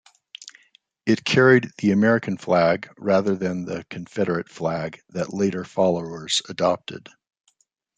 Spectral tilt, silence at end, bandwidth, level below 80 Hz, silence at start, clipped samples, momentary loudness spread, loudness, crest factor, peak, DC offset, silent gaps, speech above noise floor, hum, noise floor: -5.5 dB/octave; 1 s; 9.4 kHz; -64 dBFS; 0.4 s; under 0.1%; 15 LU; -22 LUFS; 20 dB; -2 dBFS; under 0.1%; none; 45 dB; none; -67 dBFS